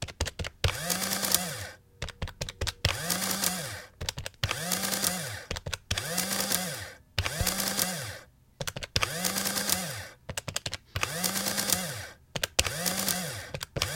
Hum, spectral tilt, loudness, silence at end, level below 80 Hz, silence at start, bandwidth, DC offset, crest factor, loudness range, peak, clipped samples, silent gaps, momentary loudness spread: none; -2 dB/octave; -30 LUFS; 0 s; -48 dBFS; 0 s; 17 kHz; under 0.1%; 30 dB; 1 LU; -2 dBFS; under 0.1%; none; 11 LU